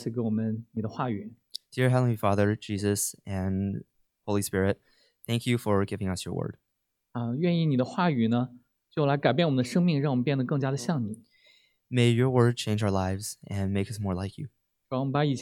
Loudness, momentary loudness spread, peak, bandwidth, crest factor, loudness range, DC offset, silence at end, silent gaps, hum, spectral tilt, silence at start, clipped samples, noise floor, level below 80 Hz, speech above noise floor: -28 LUFS; 13 LU; -8 dBFS; 16 kHz; 20 dB; 4 LU; under 0.1%; 0 s; none; none; -6 dB/octave; 0 s; under 0.1%; -80 dBFS; -64 dBFS; 53 dB